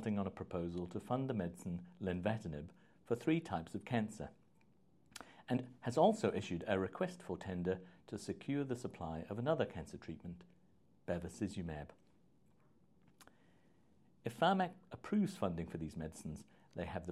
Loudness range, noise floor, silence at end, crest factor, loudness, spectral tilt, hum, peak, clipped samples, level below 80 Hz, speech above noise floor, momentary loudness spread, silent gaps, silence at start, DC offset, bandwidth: 10 LU; -72 dBFS; 0 s; 22 dB; -41 LUFS; -6.5 dB/octave; none; -18 dBFS; under 0.1%; -68 dBFS; 32 dB; 15 LU; none; 0 s; under 0.1%; 13.5 kHz